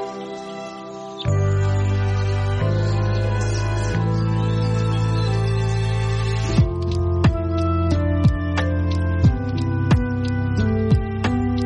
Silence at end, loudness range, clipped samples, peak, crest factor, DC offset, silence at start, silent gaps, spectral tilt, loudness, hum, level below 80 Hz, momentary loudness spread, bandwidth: 0 s; 1 LU; under 0.1%; -6 dBFS; 14 dB; under 0.1%; 0 s; none; -7.5 dB/octave; -21 LUFS; none; -30 dBFS; 4 LU; 9.4 kHz